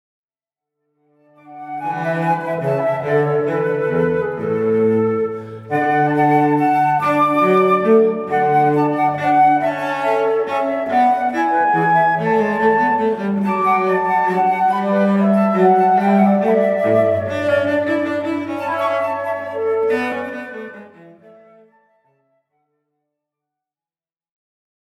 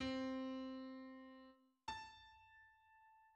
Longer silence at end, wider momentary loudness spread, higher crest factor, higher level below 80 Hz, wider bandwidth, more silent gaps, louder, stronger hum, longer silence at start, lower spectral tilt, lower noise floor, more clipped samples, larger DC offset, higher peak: first, 4.1 s vs 0 s; second, 8 LU vs 23 LU; about the same, 14 dB vs 18 dB; first, -64 dBFS vs -74 dBFS; first, 13 kHz vs 9 kHz; neither; first, -17 LUFS vs -50 LUFS; neither; first, 1.45 s vs 0 s; first, -8 dB/octave vs -4.5 dB/octave; first, under -90 dBFS vs -70 dBFS; neither; neither; first, -2 dBFS vs -34 dBFS